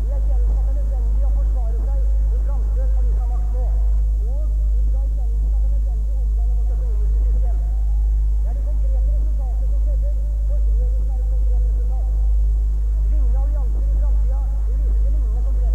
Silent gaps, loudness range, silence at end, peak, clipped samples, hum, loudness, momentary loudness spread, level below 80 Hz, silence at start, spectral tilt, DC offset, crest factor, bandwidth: none; 1 LU; 0 s; -12 dBFS; under 0.1%; 50 Hz at -35 dBFS; -22 LUFS; 2 LU; -18 dBFS; 0 s; -9 dB/octave; 1%; 6 dB; 1.3 kHz